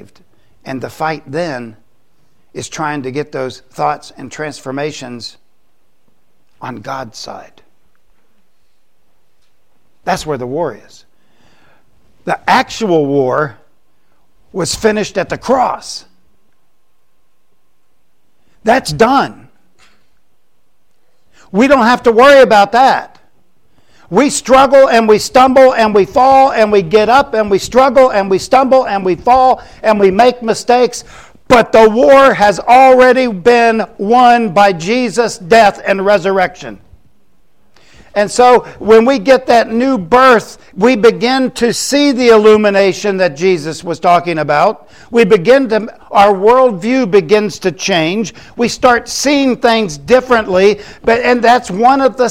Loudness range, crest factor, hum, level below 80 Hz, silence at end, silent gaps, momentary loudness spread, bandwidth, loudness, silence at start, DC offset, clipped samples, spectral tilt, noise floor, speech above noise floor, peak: 15 LU; 12 dB; none; -44 dBFS; 0 s; none; 15 LU; 16 kHz; -10 LUFS; 0.65 s; 0.7%; under 0.1%; -4.5 dB/octave; -64 dBFS; 54 dB; 0 dBFS